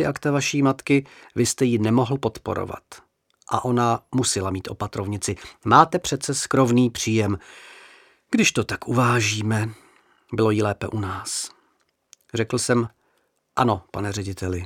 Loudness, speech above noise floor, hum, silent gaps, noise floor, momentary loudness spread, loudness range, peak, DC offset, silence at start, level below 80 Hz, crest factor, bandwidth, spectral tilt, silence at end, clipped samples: -22 LUFS; 46 dB; none; none; -68 dBFS; 11 LU; 5 LU; 0 dBFS; under 0.1%; 0 s; -54 dBFS; 22 dB; 16.5 kHz; -5 dB/octave; 0 s; under 0.1%